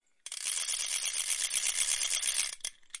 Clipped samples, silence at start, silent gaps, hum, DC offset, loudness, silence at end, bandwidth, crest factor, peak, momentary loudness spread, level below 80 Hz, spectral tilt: under 0.1%; 0.25 s; none; none; under 0.1%; -30 LUFS; 0 s; 11.5 kHz; 22 dB; -12 dBFS; 10 LU; -66 dBFS; 5 dB/octave